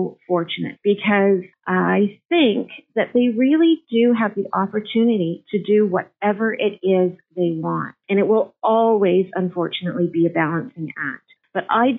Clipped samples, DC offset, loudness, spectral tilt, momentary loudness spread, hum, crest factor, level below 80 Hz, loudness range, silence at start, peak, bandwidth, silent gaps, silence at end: under 0.1%; under 0.1%; -20 LUFS; -5 dB/octave; 9 LU; none; 14 dB; -70 dBFS; 2 LU; 0 s; -6 dBFS; 4 kHz; 2.25-2.29 s; 0 s